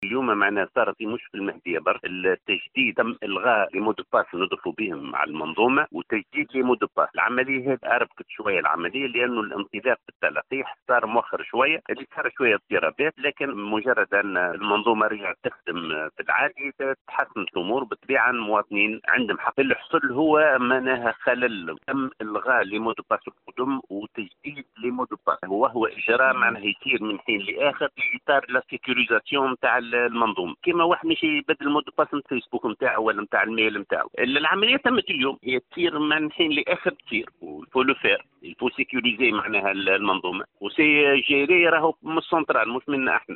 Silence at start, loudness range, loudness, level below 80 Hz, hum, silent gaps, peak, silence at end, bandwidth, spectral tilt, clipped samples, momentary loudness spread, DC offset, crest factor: 0 s; 4 LU; -23 LUFS; -66 dBFS; none; 10.15-10.20 s, 10.82-10.86 s, 17.01-17.05 s; -6 dBFS; 0 s; 4.3 kHz; -1 dB/octave; under 0.1%; 9 LU; under 0.1%; 18 dB